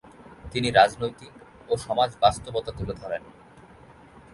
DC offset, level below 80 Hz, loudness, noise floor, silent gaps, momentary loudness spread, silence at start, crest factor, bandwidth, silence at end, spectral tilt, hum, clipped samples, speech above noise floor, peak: under 0.1%; -48 dBFS; -25 LUFS; -50 dBFS; none; 15 LU; 0.2 s; 22 dB; 11.5 kHz; 1.15 s; -4.5 dB/octave; none; under 0.1%; 26 dB; -4 dBFS